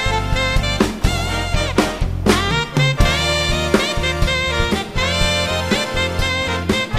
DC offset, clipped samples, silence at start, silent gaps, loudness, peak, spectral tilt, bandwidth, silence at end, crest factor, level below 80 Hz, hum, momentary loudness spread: 0.5%; under 0.1%; 0 s; none; -18 LUFS; 0 dBFS; -4.5 dB/octave; 15.5 kHz; 0 s; 16 dB; -24 dBFS; none; 4 LU